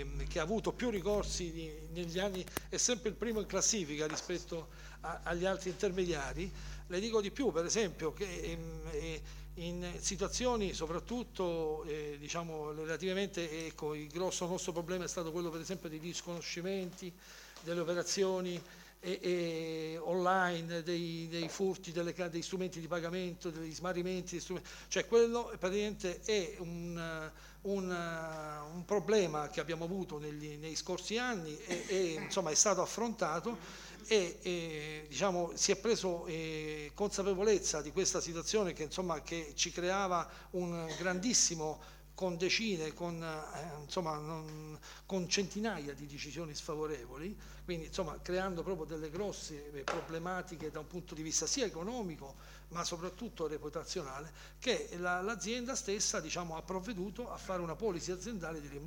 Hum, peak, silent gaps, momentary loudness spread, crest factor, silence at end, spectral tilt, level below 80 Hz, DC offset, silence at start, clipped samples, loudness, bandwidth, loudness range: none; -14 dBFS; none; 12 LU; 24 dB; 0 s; -3.5 dB/octave; -54 dBFS; under 0.1%; 0 s; under 0.1%; -37 LUFS; 17 kHz; 5 LU